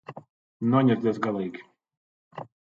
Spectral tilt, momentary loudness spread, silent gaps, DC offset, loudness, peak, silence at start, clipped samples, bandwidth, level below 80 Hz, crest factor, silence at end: -9 dB/octave; 23 LU; 0.30-0.60 s, 1.97-2.31 s; under 0.1%; -25 LUFS; -8 dBFS; 0.1 s; under 0.1%; 7.2 kHz; -70 dBFS; 20 dB; 0.35 s